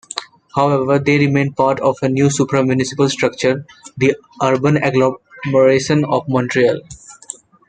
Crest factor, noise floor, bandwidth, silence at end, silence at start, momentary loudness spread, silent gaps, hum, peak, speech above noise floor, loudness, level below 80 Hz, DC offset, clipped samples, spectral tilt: 16 dB; -37 dBFS; 9.4 kHz; 0.55 s; 0.15 s; 12 LU; none; none; 0 dBFS; 22 dB; -16 LUFS; -54 dBFS; under 0.1%; under 0.1%; -6 dB/octave